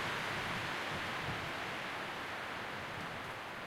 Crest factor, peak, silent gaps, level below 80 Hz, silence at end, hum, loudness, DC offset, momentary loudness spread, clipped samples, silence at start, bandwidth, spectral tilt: 14 dB; -26 dBFS; none; -64 dBFS; 0 s; none; -40 LUFS; under 0.1%; 5 LU; under 0.1%; 0 s; 16.5 kHz; -3.5 dB/octave